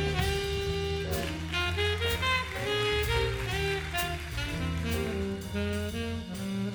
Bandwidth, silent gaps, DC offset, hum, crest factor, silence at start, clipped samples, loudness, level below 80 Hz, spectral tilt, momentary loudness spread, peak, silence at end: over 20 kHz; none; under 0.1%; none; 14 dB; 0 s; under 0.1%; -31 LUFS; -40 dBFS; -4.5 dB/octave; 6 LU; -16 dBFS; 0 s